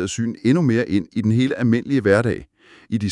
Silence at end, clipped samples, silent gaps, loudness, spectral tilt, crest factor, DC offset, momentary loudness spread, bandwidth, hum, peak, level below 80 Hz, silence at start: 0 s; under 0.1%; none; -19 LUFS; -6.5 dB/octave; 18 dB; under 0.1%; 8 LU; 11 kHz; none; -2 dBFS; -54 dBFS; 0 s